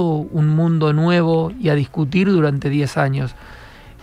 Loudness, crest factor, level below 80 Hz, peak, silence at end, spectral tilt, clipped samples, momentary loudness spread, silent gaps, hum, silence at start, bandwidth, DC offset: -17 LUFS; 16 dB; -44 dBFS; -2 dBFS; 0.1 s; -8 dB/octave; under 0.1%; 4 LU; none; none; 0 s; 10.5 kHz; under 0.1%